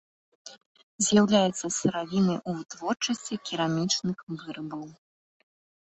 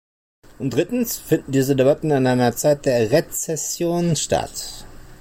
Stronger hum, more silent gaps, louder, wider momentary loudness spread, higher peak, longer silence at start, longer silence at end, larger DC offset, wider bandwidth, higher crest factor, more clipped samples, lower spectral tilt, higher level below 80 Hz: neither; first, 0.66-0.75 s, 0.83-0.98 s, 4.23-4.27 s vs none; second, -27 LUFS vs -20 LUFS; first, 17 LU vs 10 LU; second, -10 dBFS vs -6 dBFS; second, 0.45 s vs 0.6 s; first, 0.95 s vs 0.05 s; neither; second, 8.4 kHz vs 16.5 kHz; first, 20 dB vs 14 dB; neither; about the same, -4 dB/octave vs -5 dB/octave; second, -66 dBFS vs -46 dBFS